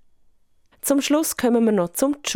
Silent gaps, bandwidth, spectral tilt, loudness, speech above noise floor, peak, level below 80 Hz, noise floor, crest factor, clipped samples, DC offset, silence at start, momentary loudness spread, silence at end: none; 17.5 kHz; -4 dB/octave; -21 LUFS; 37 dB; -6 dBFS; -58 dBFS; -57 dBFS; 16 dB; under 0.1%; under 0.1%; 0.85 s; 4 LU; 0 s